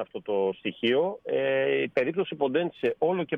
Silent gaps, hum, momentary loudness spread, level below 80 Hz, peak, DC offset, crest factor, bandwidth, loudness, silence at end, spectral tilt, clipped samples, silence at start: none; none; 4 LU; -72 dBFS; -10 dBFS; under 0.1%; 16 dB; 5.8 kHz; -27 LUFS; 0 s; -7.5 dB/octave; under 0.1%; 0 s